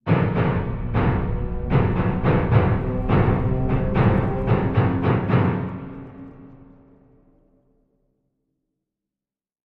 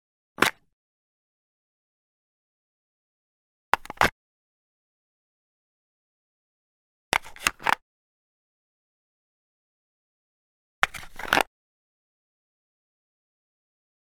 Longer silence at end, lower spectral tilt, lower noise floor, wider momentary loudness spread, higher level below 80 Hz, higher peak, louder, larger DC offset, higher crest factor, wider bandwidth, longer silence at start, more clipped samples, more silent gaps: first, 3.1 s vs 2.65 s; first, -11 dB/octave vs -2 dB/octave; about the same, under -90 dBFS vs under -90 dBFS; first, 11 LU vs 4 LU; first, -32 dBFS vs -56 dBFS; second, -4 dBFS vs 0 dBFS; first, -21 LUFS vs -26 LUFS; neither; second, 18 dB vs 34 dB; second, 4.8 kHz vs 19 kHz; second, 0.05 s vs 0.4 s; neither; second, none vs 0.73-3.72 s, 4.12-7.12 s, 7.82-10.82 s